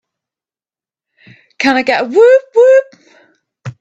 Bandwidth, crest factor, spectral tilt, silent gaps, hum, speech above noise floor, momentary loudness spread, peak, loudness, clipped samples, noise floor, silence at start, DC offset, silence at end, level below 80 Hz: 8 kHz; 14 dB; -5 dB/octave; none; none; over 81 dB; 14 LU; 0 dBFS; -10 LUFS; under 0.1%; under -90 dBFS; 1.6 s; under 0.1%; 0.1 s; -62 dBFS